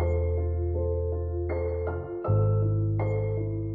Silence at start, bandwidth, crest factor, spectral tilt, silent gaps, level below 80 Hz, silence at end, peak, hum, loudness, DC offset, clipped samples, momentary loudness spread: 0 s; 2.3 kHz; 12 dB; -12.5 dB/octave; none; -38 dBFS; 0 s; -14 dBFS; none; -28 LUFS; under 0.1%; under 0.1%; 6 LU